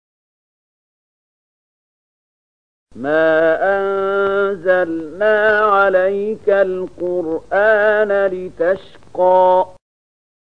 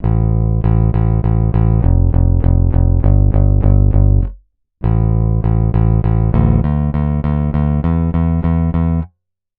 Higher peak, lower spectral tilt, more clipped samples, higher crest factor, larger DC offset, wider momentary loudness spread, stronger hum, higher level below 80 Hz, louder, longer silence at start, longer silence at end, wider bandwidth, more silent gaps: about the same, -2 dBFS vs 0 dBFS; second, -6.5 dB/octave vs -13.5 dB/octave; neither; about the same, 16 dB vs 12 dB; first, 0.8% vs under 0.1%; first, 9 LU vs 4 LU; neither; second, -56 dBFS vs -16 dBFS; about the same, -16 LUFS vs -15 LUFS; first, 2.95 s vs 0 s; first, 0.8 s vs 0.5 s; first, 6 kHz vs 3.3 kHz; neither